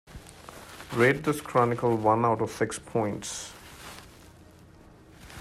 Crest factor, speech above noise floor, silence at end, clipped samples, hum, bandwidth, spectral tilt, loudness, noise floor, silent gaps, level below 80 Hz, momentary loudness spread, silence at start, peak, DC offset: 20 dB; 26 dB; 0 s; under 0.1%; none; 15.5 kHz; -5.5 dB/octave; -27 LUFS; -52 dBFS; none; -56 dBFS; 22 LU; 0.1 s; -8 dBFS; under 0.1%